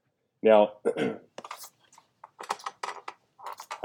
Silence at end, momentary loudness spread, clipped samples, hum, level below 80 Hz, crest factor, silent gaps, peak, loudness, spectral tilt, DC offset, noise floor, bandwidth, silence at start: 0.05 s; 24 LU; under 0.1%; none; -86 dBFS; 24 dB; none; -6 dBFS; -27 LUFS; -5 dB/octave; under 0.1%; -61 dBFS; 19.5 kHz; 0.45 s